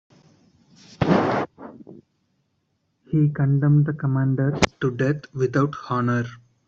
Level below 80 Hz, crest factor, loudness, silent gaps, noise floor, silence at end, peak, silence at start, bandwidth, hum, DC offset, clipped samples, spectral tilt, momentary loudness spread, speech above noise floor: -52 dBFS; 20 dB; -22 LUFS; none; -71 dBFS; 0.3 s; -2 dBFS; 1 s; 8.2 kHz; none; under 0.1%; under 0.1%; -7 dB/octave; 8 LU; 50 dB